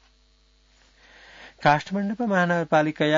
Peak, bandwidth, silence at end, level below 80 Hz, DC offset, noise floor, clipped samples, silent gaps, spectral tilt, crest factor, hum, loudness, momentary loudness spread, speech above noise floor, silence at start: -4 dBFS; 7.6 kHz; 0 s; -62 dBFS; under 0.1%; -60 dBFS; under 0.1%; none; -6.5 dB/octave; 20 dB; none; -23 LUFS; 4 LU; 38 dB; 1.4 s